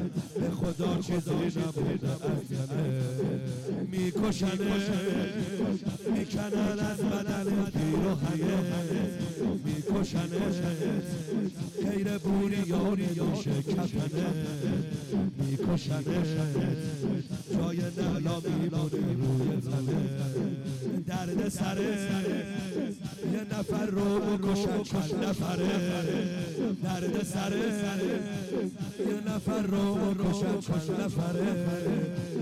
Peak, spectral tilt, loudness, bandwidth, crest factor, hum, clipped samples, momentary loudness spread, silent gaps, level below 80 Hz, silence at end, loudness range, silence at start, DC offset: -20 dBFS; -6.5 dB/octave; -31 LUFS; 15 kHz; 10 dB; none; under 0.1%; 4 LU; none; -54 dBFS; 0 s; 1 LU; 0 s; under 0.1%